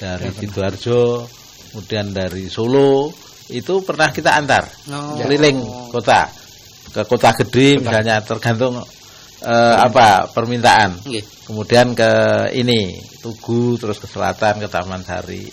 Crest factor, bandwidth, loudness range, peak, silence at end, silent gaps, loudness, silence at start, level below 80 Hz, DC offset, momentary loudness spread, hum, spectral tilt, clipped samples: 16 dB; 16 kHz; 5 LU; 0 dBFS; 0 s; none; -16 LUFS; 0 s; -48 dBFS; under 0.1%; 16 LU; none; -5 dB/octave; under 0.1%